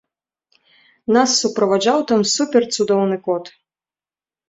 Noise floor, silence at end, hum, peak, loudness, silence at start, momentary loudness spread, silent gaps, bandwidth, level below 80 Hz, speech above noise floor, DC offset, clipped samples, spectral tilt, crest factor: under -90 dBFS; 1 s; none; -2 dBFS; -17 LUFS; 1.1 s; 8 LU; none; 8.2 kHz; -64 dBFS; over 73 dB; under 0.1%; under 0.1%; -3.5 dB/octave; 18 dB